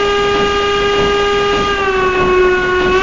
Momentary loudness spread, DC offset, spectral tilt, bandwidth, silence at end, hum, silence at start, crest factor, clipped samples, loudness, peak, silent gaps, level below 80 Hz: 2 LU; 0.3%; -4.5 dB/octave; 7.6 kHz; 0 s; none; 0 s; 12 dB; under 0.1%; -13 LUFS; 0 dBFS; none; -30 dBFS